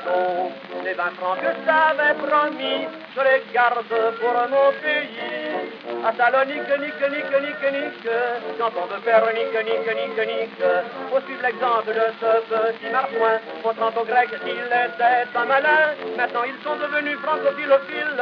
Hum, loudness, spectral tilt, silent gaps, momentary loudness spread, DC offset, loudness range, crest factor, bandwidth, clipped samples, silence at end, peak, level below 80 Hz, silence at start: none; -21 LUFS; -5.5 dB/octave; none; 8 LU; under 0.1%; 2 LU; 18 dB; 5.4 kHz; under 0.1%; 0 s; -4 dBFS; under -90 dBFS; 0 s